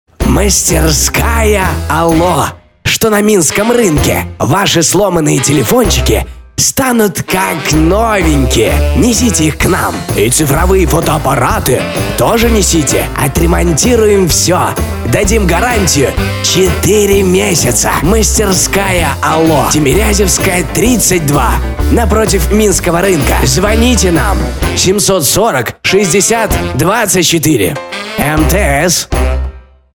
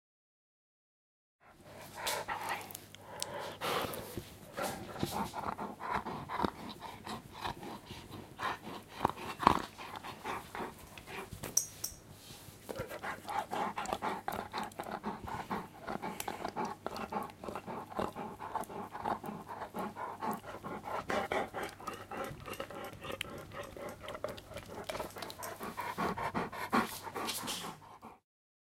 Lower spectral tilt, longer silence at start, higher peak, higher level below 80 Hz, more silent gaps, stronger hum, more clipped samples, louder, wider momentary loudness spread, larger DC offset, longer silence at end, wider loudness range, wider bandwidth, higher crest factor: about the same, -4 dB/octave vs -3.5 dB/octave; second, 0.2 s vs 1.45 s; first, 0 dBFS vs -6 dBFS; first, -18 dBFS vs -62 dBFS; neither; neither; neither; first, -10 LUFS vs -40 LUFS; second, 5 LU vs 11 LU; first, 0.3% vs under 0.1%; about the same, 0.35 s vs 0.45 s; second, 1 LU vs 5 LU; first, 20 kHz vs 16.5 kHz; second, 10 dB vs 34 dB